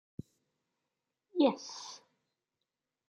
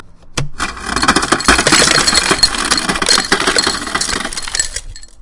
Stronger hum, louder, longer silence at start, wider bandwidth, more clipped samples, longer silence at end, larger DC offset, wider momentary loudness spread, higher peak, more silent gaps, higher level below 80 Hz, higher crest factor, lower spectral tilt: neither; second, -33 LUFS vs -12 LUFS; first, 1.35 s vs 0 s; second, 9.2 kHz vs 12 kHz; second, under 0.1% vs 0.2%; first, 1.15 s vs 0.15 s; neither; first, 21 LU vs 13 LU; second, -16 dBFS vs 0 dBFS; neither; second, -78 dBFS vs -30 dBFS; first, 24 dB vs 14 dB; first, -5 dB/octave vs -1.5 dB/octave